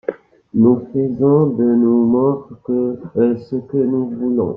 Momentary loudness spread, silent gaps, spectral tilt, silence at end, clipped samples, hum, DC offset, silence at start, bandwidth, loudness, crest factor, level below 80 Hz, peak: 9 LU; none; -13 dB/octave; 0 s; under 0.1%; none; under 0.1%; 0.1 s; 2.8 kHz; -17 LUFS; 14 dB; -56 dBFS; -2 dBFS